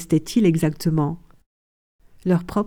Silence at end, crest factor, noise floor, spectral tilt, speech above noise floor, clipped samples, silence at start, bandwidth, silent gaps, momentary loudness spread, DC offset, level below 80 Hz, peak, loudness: 0 s; 16 dB; under -90 dBFS; -7 dB/octave; over 70 dB; under 0.1%; 0 s; 17 kHz; 1.46-1.99 s; 10 LU; under 0.1%; -48 dBFS; -6 dBFS; -21 LUFS